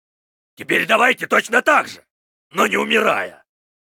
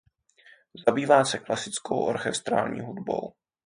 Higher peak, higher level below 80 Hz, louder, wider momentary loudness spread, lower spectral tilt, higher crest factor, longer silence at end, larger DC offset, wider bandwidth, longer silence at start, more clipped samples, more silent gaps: first, -2 dBFS vs -6 dBFS; about the same, -66 dBFS vs -66 dBFS; first, -16 LUFS vs -26 LUFS; first, 15 LU vs 11 LU; about the same, -3 dB/octave vs -4 dB/octave; about the same, 18 dB vs 22 dB; first, 0.65 s vs 0.35 s; neither; first, 19 kHz vs 10.5 kHz; second, 0.6 s vs 0.75 s; neither; first, 2.10-2.51 s vs none